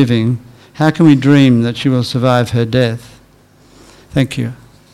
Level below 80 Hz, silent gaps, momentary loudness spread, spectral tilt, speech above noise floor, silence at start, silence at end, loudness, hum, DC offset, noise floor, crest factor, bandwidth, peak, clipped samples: -46 dBFS; none; 12 LU; -7 dB/octave; 35 dB; 0 s; 0.4 s; -13 LUFS; none; under 0.1%; -46 dBFS; 14 dB; 13 kHz; 0 dBFS; 0.7%